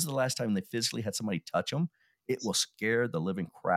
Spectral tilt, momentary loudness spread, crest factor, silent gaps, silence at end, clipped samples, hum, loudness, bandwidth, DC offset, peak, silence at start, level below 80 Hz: -4 dB/octave; 6 LU; 18 dB; none; 0 s; under 0.1%; none; -32 LUFS; 16.5 kHz; under 0.1%; -14 dBFS; 0 s; -72 dBFS